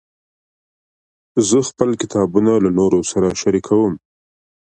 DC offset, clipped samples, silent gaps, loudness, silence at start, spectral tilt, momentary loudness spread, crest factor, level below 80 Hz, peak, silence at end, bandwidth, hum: under 0.1%; under 0.1%; none; -16 LUFS; 1.35 s; -5.5 dB/octave; 5 LU; 18 dB; -48 dBFS; 0 dBFS; 0.8 s; 9.6 kHz; none